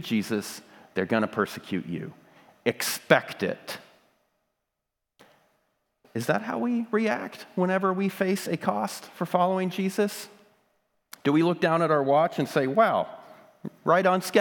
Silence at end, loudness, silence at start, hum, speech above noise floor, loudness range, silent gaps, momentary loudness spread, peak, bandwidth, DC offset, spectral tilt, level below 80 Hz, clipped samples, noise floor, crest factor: 0 s; -26 LUFS; 0 s; none; 58 dB; 6 LU; none; 15 LU; -2 dBFS; 19.5 kHz; under 0.1%; -5.5 dB/octave; -78 dBFS; under 0.1%; -84 dBFS; 26 dB